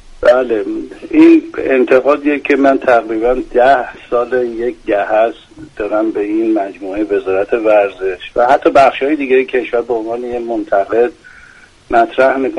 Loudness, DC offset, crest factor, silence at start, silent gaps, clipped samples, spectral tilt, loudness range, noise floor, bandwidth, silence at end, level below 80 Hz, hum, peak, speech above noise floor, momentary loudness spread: -13 LUFS; under 0.1%; 12 dB; 0.2 s; none; under 0.1%; -6 dB/octave; 5 LU; -42 dBFS; 9.6 kHz; 0 s; -42 dBFS; none; 0 dBFS; 29 dB; 9 LU